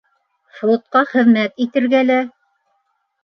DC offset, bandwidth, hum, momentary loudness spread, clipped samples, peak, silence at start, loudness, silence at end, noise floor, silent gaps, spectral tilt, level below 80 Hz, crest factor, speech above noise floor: under 0.1%; 6.2 kHz; none; 6 LU; under 0.1%; -2 dBFS; 0.55 s; -16 LUFS; 0.95 s; -67 dBFS; none; -7 dB/octave; -72 dBFS; 16 dB; 52 dB